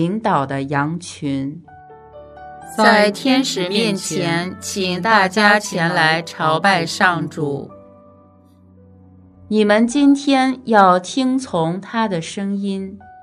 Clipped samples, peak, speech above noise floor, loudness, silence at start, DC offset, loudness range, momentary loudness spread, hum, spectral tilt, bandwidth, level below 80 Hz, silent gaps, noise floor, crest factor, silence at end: under 0.1%; 0 dBFS; 32 dB; -17 LUFS; 0 s; under 0.1%; 4 LU; 12 LU; none; -4.5 dB/octave; 14 kHz; -60 dBFS; none; -48 dBFS; 18 dB; 0.1 s